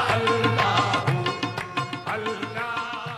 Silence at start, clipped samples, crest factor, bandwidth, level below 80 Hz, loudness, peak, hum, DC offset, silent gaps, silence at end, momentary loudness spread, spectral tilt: 0 s; under 0.1%; 16 dB; 14.5 kHz; -56 dBFS; -24 LUFS; -8 dBFS; none; under 0.1%; none; 0 s; 8 LU; -5 dB/octave